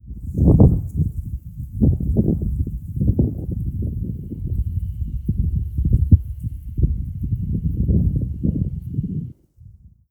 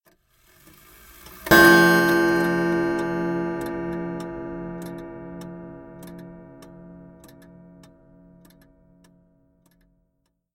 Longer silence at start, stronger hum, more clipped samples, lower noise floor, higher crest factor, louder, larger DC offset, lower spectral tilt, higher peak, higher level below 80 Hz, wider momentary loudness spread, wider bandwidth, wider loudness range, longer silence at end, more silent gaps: second, 0.05 s vs 1.3 s; neither; neither; second, -46 dBFS vs -73 dBFS; about the same, 20 dB vs 24 dB; second, -22 LUFS vs -19 LUFS; neither; first, -13.5 dB/octave vs -5 dB/octave; about the same, 0 dBFS vs 0 dBFS; first, -26 dBFS vs -50 dBFS; second, 13 LU vs 28 LU; second, 1.3 kHz vs 17 kHz; second, 5 LU vs 23 LU; second, 0.4 s vs 3.5 s; neither